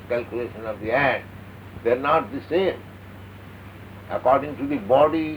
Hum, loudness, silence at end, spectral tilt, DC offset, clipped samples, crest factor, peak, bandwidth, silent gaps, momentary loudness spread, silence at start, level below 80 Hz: none; -23 LUFS; 0 s; -7.5 dB/octave; under 0.1%; under 0.1%; 18 dB; -6 dBFS; over 20 kHz; none; 22 LU; 0 s; -52 dBFS